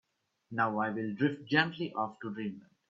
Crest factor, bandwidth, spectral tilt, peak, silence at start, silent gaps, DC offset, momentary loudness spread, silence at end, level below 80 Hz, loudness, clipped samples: 24 dB; 7.4 kHz; -7.5 dB/octave; -10 dBFS; 0.5 s; none; under 0.1%; 11 LU; 0.3 s; -76 dBFS; -33 LUFS; under 0.1%